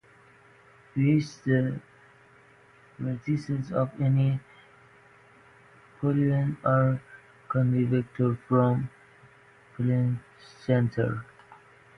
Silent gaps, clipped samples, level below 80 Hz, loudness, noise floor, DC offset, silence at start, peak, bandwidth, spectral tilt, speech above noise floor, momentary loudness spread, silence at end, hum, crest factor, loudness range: none; under 0.1%; -60 dBFS; -27 LUFS; -57 dBFS; under 0.1%; 0.95 s; -10 dBFS; 6.6 kHz; -9 dB/octave; 31 dB; 12 LU; 0.45 s; none; 18 dB; 4 LU